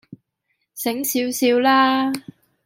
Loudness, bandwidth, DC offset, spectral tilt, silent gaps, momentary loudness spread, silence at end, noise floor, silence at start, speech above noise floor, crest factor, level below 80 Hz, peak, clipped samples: -19 LUFS; 16.5 kHz; under 0.1%; -2.5 dB/octave; none; 13 LU; 0.45 s; -73 dBFS; 0.1 s; 55 dB; 18 dB; -70 dBFS; -4 dBFS; under 0.1%